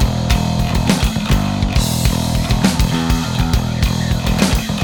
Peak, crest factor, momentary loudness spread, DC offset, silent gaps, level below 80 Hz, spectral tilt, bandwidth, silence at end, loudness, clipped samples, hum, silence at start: -2 dBFS; 14 dB; 2 LU; under 0.1%; none; -20 dBFS; -5 dB/octave; 19 kHz; 0 s; -16 LUFS; under 0.1%; none; 0 s